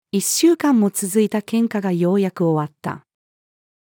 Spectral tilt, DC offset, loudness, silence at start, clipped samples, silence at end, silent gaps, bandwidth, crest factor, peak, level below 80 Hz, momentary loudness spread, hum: -5 dB/octave; under 0.1%; -18 LUFS; 0.15 s; under 0.1%; 0.85 s; none; 20 kHz; 14 dB; -6 dBFS; -76 dBFS; 12 LU; none